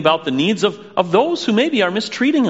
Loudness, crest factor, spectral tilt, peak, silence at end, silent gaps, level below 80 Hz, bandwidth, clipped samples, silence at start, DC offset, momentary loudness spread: -17 LUFS; 16 dB; -3.5 dB/octave; 0 dBFS; 0 s; none; -64 dBFS; 8 kHz; under 0.1%; 0 s; 0.1%; 3 LU